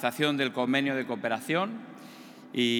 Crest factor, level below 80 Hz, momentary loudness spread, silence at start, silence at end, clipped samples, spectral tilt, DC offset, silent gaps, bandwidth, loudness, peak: 18 dB; -88 dBFS; 20 LU; 0 s; 0 s; under 0.1%; -4.5 dB/octave; under 0.1%; none; 18.5 kHz; -29 LUFS; -10 dBFS